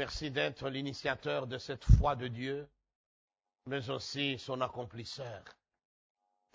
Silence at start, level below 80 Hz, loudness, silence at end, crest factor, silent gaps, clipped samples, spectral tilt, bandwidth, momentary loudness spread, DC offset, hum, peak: 0 s; -40 dBFS; -35 LUFS; 1 s; 26 dB; 2.95-3.28 s; under 0.1%; -6 dB/octave; 7.8 kHz; 16 LU; under 0.1%; none; -10 dBFS